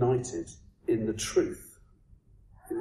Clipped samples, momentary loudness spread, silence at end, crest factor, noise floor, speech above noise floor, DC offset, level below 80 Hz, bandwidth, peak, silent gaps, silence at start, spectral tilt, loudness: under 0.1%; 17 LU; 0 s; 18 dB; -59 dBFS; 27 dB; under 0.1%; -54 dBFS; 13 kHz; -14 dBFS; none; 0 s; -5.5 dB/octave; -31 LUFS